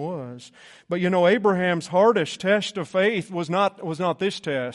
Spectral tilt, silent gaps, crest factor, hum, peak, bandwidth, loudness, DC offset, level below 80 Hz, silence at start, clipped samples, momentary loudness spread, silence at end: -5.5 dB/octave; none; 16 dB; none; -6 dBFS; 11.5 kHz; -22 LUFS; under 0.1%; -68 dBFS; 0 s; under 0.1%; 11 LU; 0 s